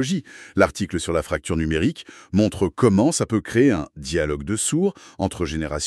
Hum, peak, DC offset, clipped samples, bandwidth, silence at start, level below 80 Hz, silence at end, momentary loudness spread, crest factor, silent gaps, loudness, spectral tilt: none; -4 dBFS; under 0.1%; under 0.1%; 13 kHz; 0 s; -40 dBFS; 0 s; 8 LU; 18 dB; none; -22 LUFS; -5 dB/octave